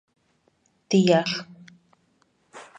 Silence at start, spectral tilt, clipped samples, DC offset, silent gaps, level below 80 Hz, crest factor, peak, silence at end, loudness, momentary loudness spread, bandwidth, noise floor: 0.9 s; -5.5 dB/octave; under 0.1%; under 0.1%; none; -70 dBFS; 22 dB; -4 dBFS; 0.15 s; -22 LUFS; 26 LU; 9 kHz; -67 dBFS